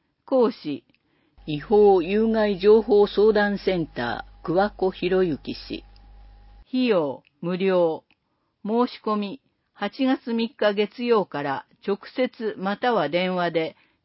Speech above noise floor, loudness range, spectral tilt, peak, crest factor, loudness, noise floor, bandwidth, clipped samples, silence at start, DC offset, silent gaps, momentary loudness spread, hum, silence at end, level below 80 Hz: 51 dB; 6 LU; -10.5 dB/octave; -6 dBFS; 16 dB; -23 LUFS; -73 dBFS; 5.8 kHz; under 0.1%; 0.3 s; under 0.1%; none; 15 LU; none; 0.35 s; -52 dBFS